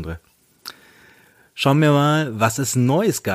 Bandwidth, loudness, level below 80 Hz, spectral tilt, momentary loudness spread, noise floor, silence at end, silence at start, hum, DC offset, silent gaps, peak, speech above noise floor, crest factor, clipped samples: 15.5 kHz; -18 LUFS; -50 dBFS; -5.5 dB/octave; 22 LU; -53 dBFS; 0 s; 0 s; none; under 0.1%; none; -2 dBFS; 35 dB; 18 dB; under 0.1%